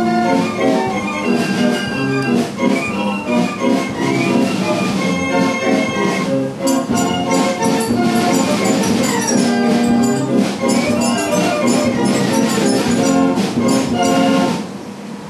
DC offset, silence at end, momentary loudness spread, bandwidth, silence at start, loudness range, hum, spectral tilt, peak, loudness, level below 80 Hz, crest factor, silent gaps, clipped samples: under 0.1%; 0 s; 3 LU; 14.5 kHz; 0 s; 2 LU; none; -4.5 dB/octave; -2 dBFS; -16 LUFS; -50 dBFS; 14 dB; none; under 0.1%